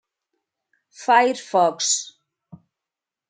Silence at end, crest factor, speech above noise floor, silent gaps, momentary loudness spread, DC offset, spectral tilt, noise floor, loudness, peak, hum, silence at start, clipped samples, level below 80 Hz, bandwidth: 1.25 s; 20 dB; 68 dB; none; 11 LU; under 0.1%; -1.5 dB/octave; -88 dBFS; -20 LUFS; -2 dBFS; none; 1 s; under 0.1%; -82 dBFS; 9.6 kHz